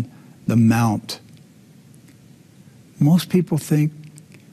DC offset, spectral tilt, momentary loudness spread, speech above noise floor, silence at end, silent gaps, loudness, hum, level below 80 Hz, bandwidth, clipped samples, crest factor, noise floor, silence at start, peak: under 0.1%; -7 dB/octave; 17 LU; 30 dB; 0.45 s; none; -19 LUFS; none; -56 dBFS; 14.5 kHz; under 0.1%; 16 dB; -48 dBFS; 0 s; -6 dBFS